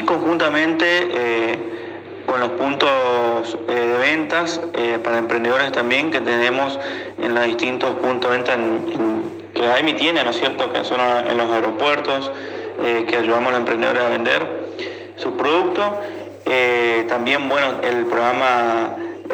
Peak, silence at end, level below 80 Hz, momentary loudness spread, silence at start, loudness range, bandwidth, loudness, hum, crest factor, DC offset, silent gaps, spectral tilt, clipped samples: 0 dBFS; 0 s; -70 dBFS; 10 LU; 0 s; 1 LU; 19 kHz; -19 LUFS; none; 18 dB; under 0.1%; none; -4.5 dB/octave; under 0.1%